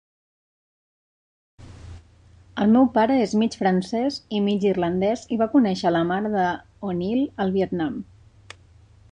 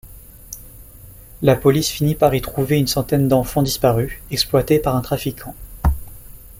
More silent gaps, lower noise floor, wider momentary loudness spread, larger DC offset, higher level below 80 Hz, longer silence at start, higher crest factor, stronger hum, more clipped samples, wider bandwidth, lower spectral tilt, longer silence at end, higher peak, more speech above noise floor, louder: neither; first, -52 dBFS vs -41 dBFS; second, 11 LU vs 17 LU; neither; second, -54 dBFS vs -32 dBFS; first, 1.6 s vs 0.05 s; about the same, 16 dB vs 18 dB; neither; neither; second, 9.8 kHz vs 17 kHz; first, -7 dB/octave vs -5.5 dB/octave; first, 1.1 s vs 0.1 s; second, -8 dBFS vs -2 dBFS; first, 31 dB vs 23 dB; second, -22 LUFS vs -18 LUFS